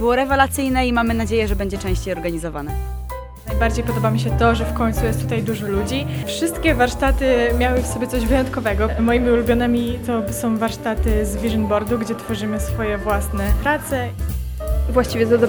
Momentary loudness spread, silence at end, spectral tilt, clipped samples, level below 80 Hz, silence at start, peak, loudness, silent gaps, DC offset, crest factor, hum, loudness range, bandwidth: 8 LU; 0 s; -6 dB/octave; under 0.1%; -26 dBFS; 0 s; -2 dBFS; -20 LUFS; none; 0.1%; 16 dB; none; 3 LU; over 20 kHz